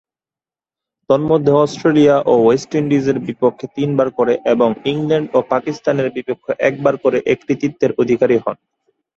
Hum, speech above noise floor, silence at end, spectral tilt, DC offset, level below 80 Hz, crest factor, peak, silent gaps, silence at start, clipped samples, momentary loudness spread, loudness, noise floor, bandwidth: none; over 75 dB; 0.65 s; -7 dB/octave; under 0.1%; -56 dBFS; 16 dB; 0 dBFS; none; 1.1 s; under 0.1%; 7 LU; -16 LUFS; under -90 dBFS; 8 kHz